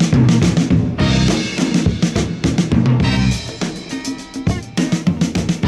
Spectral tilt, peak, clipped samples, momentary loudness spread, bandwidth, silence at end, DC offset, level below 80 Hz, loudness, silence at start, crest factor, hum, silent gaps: -6 dB/octave; -4 dBFS; under 0.1%; 10 LU; 12 kHz; 0 s; under 0.1%; -30 dBFS; -17 LUFS; 0 s; 12 dB; none; none